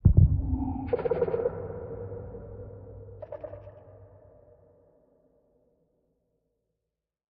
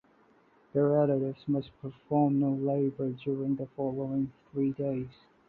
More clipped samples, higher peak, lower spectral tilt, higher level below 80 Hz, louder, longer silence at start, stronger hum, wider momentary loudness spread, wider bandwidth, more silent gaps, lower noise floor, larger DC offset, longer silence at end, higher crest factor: neither; first, -6 dBFS vs -14 dBFS; about the same, -11.5 dB/octave vs -12 dB/octave; first, -38 dBFS vs -66 dBFS; about the same, -29 LUFS vs -30 LUFS; second, 0.05 s vs 0.75 s; neither; first, 22 LU vs 9 LU; second, 3.2 kHz vs 4.4 kHz; neither; first, -86 dBFS vs -64 dBFS; neither; first, 3.35 s vs 0.35 s; first, 24 dB vs 16 dB